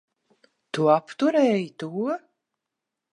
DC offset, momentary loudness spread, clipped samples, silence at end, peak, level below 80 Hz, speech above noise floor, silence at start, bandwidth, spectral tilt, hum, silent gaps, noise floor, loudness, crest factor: under 0.1%; 12 LU; under 0.1%; 0.95 s; -6 dBFS; -80 dBFS; 62 dB; 0.75 s; 11 kHz; -6.5 dB/octave; none; none; -85 dBFS; -24 LUFS; 20 dB